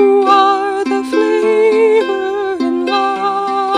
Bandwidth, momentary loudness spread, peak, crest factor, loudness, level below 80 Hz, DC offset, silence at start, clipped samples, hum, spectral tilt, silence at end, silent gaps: 10.5 kHz; 7 LU; 0 dBFS; 12 dB; -13 LUFS; -58 dBFS; under 0.1%; 0 s; under 0.1%; none; -4 dB/octave; 0 s; none